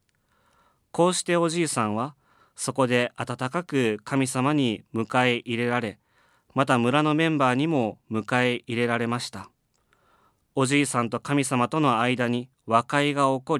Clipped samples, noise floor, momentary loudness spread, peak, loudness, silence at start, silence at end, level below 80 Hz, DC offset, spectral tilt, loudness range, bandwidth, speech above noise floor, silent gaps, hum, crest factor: under 0.1%; -67 dBFS; 9 LU; -4 dBFS; -24 LUFS; 0.95 s; 0 s; -72 dBFS; under 0.1%; -5 dB/octave; 3 LU; 14 kHz; 43 dB; none; none; 20 dB